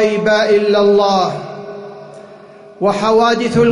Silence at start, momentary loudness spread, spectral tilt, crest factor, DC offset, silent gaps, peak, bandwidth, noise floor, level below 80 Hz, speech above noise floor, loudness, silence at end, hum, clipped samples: 0 s; 19 LU; -5.5 dB/octave; 10 dB; under 0.1%; none; -4 dBFS; 11 kHz; -38 dBFS; -50 dBFS; 26 dB; -13 LUFS; 0 s; none; under 0.1%